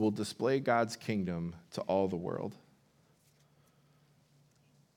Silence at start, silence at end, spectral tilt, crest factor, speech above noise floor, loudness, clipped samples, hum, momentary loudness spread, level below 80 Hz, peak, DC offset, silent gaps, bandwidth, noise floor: 0 s; 2.4 s; -6 dB/octave; 22 dB; 35 dB; -34 LUFS; under 0.1%; none; 11 LU; -76 dBFS; -14 dBFS; under 0.1%; none; 17 kHz; -69 dBFS